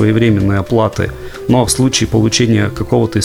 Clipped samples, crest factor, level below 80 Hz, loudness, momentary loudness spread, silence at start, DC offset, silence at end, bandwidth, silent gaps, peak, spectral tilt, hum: under 0.1%; 12 dB; -34 dBFS; -13 LUFS; 6 LU; 0 s; under 0.1%; 0 s; 16 kHz; none; 0 dBFS; -5 dB/octave; none